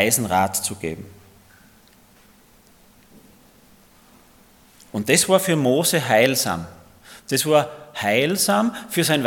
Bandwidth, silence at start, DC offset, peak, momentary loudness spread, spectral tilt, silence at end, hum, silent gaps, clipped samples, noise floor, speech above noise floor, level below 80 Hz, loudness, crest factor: 18 kHz; 0 s; under 0.1%; 0 dBFS; 14 LU; -3.5 dB/octave; 0 s; none; none; under 0.1%; -53 dBFS; 33 dB; -60 dBFS; -20 LUFS; 22 dB